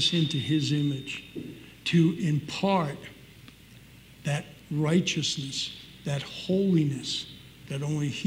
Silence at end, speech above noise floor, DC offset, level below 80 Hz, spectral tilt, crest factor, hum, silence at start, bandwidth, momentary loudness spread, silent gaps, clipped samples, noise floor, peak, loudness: 0 s; 24 dB; under 0.1%; -62 dBFS; -5 dB/octave; 16 dB; none; 0 s; 16 kHz; 14 LU; none; under 0.1%; -51 dBFS; -12 dBFS; -28 LUFS